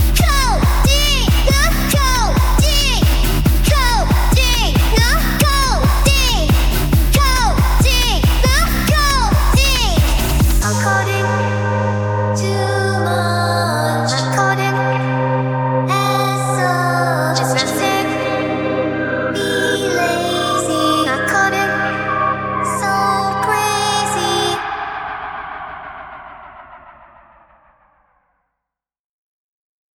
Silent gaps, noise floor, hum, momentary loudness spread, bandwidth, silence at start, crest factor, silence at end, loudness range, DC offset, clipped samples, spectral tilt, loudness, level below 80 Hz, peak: none; -82 dBFS; none; 5 LU; over 20 kHz; 0 s; 14 dB; 3.15 s; 4 LU; under 0.1%; under 0.1%; -4 dB/octave; -15 LUFS; -20 dBFS; 0 dBFS